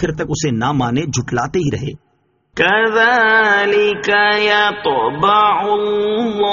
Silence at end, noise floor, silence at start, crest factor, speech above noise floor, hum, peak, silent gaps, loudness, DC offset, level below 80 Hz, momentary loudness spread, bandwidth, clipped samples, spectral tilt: 0 s; -59 dBFS; 0 s; 16 dB; 45 dB; none; 0 dBFS; none; -14 LUFS; under 0.1%; -44 dBFS; 8 LU; 7.4 kHz; under 0.1%; -2.5 dB/octave